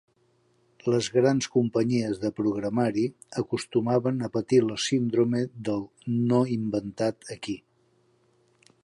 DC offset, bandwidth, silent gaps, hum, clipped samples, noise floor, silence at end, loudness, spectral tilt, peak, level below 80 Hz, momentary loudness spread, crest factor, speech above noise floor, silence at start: under 0.1%; 11.5 kHz; none; none; under 0.1%; -67 dBFS; 1.25 s; -26 LUFS; -6 dB/octave; -10 dBFS; -64 dBFS; 9 LU; 18 dB; 41 dB; 0.85 s